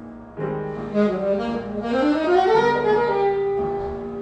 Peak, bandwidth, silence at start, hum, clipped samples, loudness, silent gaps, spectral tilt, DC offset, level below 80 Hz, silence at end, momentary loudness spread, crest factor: -6 dBFS; 8.8 kHz; 0 s; none; under 0.1%; -21 LUFS; none; -7 dB/octave; under 0.1%; -46 dBFS; 0 s; 11 LU; 16 dB